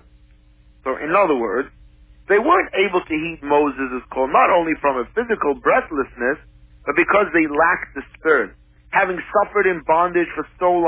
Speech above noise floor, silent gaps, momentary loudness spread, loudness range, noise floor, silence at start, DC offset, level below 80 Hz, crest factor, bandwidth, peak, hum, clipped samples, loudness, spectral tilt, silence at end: 32 dB; none; 10 LU; 1 LU; -50 dBFS; 0.85 s; under 0.1%; -48 dBFS; 16 dB; 4 kHz; -4 dBFS; none; under 0.1%; -19 LUFS; -8.5 dB/octave; 0 s